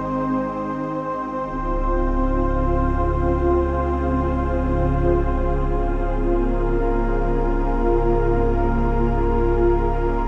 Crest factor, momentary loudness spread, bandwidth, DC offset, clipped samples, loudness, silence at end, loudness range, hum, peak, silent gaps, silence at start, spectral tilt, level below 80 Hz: 14 dB; 6 LU; 3.9 kHz; under 0.1%; under 0.1%; -22 LUFS; 0 s; 1 LU; none; -6 dBFS; none; 0 s; -10 dB/octave; -22 dBFS